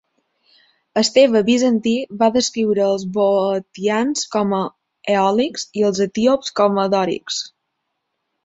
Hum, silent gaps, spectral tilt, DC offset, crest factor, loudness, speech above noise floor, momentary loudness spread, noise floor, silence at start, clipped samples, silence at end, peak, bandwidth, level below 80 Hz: none; none; -4.5 dB/octave; under 0.1%; 16 dB; -18 LUFS; 58 dB; 9 LU; -75 dBFS; 0.95 s; under 0.1%; 0.95 s; -2 dBFS; 8 kHz; -60 dBFS